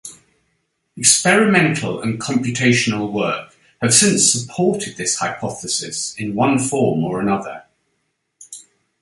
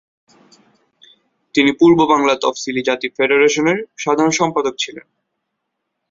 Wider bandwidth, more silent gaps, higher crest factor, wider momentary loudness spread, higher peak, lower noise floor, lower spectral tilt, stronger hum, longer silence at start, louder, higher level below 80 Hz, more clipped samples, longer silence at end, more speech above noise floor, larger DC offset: first, 12 kHz vs 7.8 kHz; neither; about the same, 20 dB vs 16 dB; first, 15 LU vs 9 LU; about the same, 0 dBFS vs -2 dBFS; second, -70 dBFS vs -75 dBFS; about the same, -3 dB/octave vs -4 dB/octave; neither; second, 0.05 s vs 1.55 s; about the same, -17 LUFS vs -15 LUFS; about the same, -56 dBFS vs -58 dBFS; neither; second, 0.4 s vs 1.1 s; second, 53 dB vs 60 dB; neither